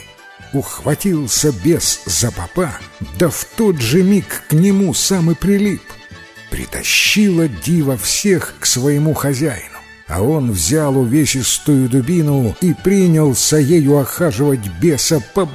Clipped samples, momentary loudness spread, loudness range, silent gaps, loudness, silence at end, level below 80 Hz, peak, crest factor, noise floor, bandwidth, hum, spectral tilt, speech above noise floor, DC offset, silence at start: under 0.1%; 8 LU; 3 LU; none; -14 LUFS; 0 s; -38 dBFS; 0 dBFS; 14 dB; -39 dBFS; 16 kHz; none; -4.5 dB/octave; 24 dB; under 0.1%; 0 s